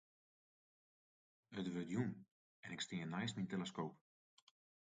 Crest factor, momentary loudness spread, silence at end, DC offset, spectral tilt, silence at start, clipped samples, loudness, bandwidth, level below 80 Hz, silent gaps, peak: 20 dB; 10 LU; 0.9 s; under 0.1%; -5.5 dB/octave; 1.5 s; under 0.1%; -46 LUFS; 9 kHz; -82 dBFS; 2.31-2.63 s; -28 dBFS